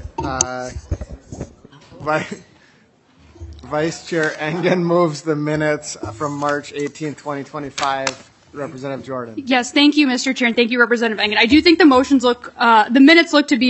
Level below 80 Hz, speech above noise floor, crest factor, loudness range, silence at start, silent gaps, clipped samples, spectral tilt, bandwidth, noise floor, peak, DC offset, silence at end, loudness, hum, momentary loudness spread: -44 dBFS; 37 dB; 18 dB; 12 LU; 0 s; none; under 0.1%; -4 dB/octave; 8.4 kHz; -53 dBFS; 0 dBFS; under 0.1%; 0 s; -16 LUFS; none; 18 LU